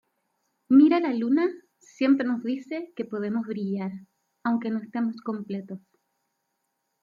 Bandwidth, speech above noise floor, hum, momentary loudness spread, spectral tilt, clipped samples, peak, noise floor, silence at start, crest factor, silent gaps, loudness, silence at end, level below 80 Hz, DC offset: 7.2 kHz; 53 dB; none; 16 LU; -7.5 dB/octave; under 0.1%; -8 dBFS; -78 dBFS; 0.7 s; 18 dB; none; -26 LUFS; 1.25 s; -78 dBFS; under 0.1%